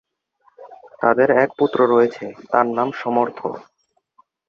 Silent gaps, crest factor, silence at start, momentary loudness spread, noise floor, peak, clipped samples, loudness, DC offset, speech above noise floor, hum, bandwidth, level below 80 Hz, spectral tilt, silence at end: none; 18 dB; 0.6 s; 14 LU; -61 dBFS; -2 dBFS; under 0.1%; -18 LUFS; under 0.1%; 43 dB; none; 6.8 kHz; -66 dBFS; -7.5 dB/octave; 0.9 s